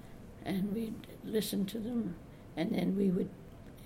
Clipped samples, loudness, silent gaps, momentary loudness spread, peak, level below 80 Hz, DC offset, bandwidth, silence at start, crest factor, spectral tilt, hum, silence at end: under 0.1%; -36 LUFS; none; 16 LU; -20 dBFS; -58 dBFS; under 0.1%; 16.5 kHz; 0 s; 16 dB; -6.5 dB/octave; none; 0 s